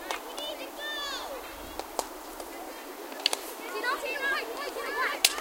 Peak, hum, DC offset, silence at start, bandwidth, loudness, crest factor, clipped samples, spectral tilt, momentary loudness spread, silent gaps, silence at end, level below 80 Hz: -2 dBFS; none; under 0.1%; 0 s; 17 kHz; -32 LUFS; 30 dB; under 0.1%; 0.5 dB/octave; 11 LU; none; 0 s; -60 dBFS